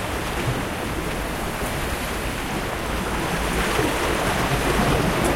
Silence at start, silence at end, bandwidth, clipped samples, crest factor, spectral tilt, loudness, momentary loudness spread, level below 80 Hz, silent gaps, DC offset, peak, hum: 0 s; 0 s; 16.5 kHz; under 0.1%; 16 dB; -4.5 dB/octave; -24 LUFS; 6 LU; -32 dBFS; none; under 0.1%; -6 dBFS; none